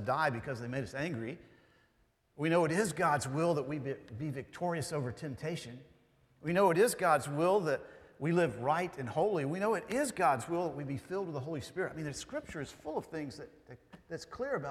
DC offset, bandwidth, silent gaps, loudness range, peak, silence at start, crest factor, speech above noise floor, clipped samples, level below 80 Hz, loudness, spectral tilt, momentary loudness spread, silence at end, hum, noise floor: under 0.1%; 15.5 kHz; none; 8 LU; -14 dBFS; 0 s; 20 dB; 39 dB; under 0.1%; -66 dBFS; -34 LUFS; -5.5 dB/octave; 13 LU; 0 s; none; -73 dBFS